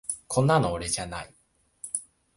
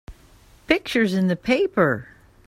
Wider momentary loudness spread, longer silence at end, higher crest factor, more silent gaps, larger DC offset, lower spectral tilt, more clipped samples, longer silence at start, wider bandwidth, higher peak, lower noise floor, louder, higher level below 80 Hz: first, 18 LU vs 3 LU; about the same, 0.35 s vs 0.45 s; about the same, 18 dB vs 20 dB; neither; neither; second, -4.5 dB/octave vs -6 dB/octave; neither; about the same, 0.1 s vs 0.1 s; second, 11.5 kHz vs 15.5 kHz; second, -10 dBFS vs -2 dBFS; about the same, -49 dBFS vs -52 dBFS; second, -27 LUFS vs -21 LUFS; about the same, -50 dBFS vs -50 dBFS